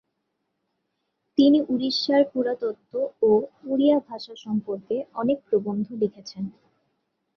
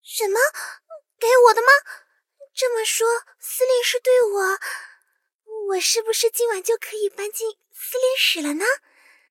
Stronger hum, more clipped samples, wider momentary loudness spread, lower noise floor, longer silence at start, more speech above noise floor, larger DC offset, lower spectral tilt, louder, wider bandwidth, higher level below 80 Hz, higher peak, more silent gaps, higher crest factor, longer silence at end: neither; neither; second, 13 LU vs 16 LU; first, -77 dBFS vs -68 dBFS; first, 1.4 s vs 0.1 s; first, 54 dB vs 48 dB; neither; first, -6.5 dB/octave vs 2 dB/octave; second, -24 LUFS vs -20 LUFS; second, 6.8 kHz vs 17 kHz; first, -68 dBFS vs -78 dBFS; second, -8 dBFS vs 0 dBFS; second, none vs 5.35-5.39 s; about the same, 18 dB vs 20 dB; first, 0.85 s vs 0.55 s